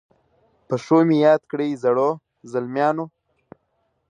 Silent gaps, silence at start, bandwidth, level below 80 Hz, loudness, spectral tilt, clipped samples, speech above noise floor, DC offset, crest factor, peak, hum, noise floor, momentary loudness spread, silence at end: none; 0.7 s; 9.4 kHz; -72 dBFS; -20 LUFS; -7.5 dB/octave; under 0.1%; 51 dB; under 0.1%; 18 dB; -4 dBFS; none; -70 dBFS; 13 LU; 1.05 s